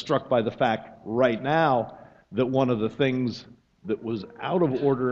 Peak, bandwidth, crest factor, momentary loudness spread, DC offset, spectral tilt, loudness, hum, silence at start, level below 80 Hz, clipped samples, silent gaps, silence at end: -6 dBFS; 7.4 kHz; 20 dB; 10 LU; under 0.1%; -7.5 dB/octave; -25 LUFS; none; 0 s; -62 dBFS; under 0.1%; none; 0 s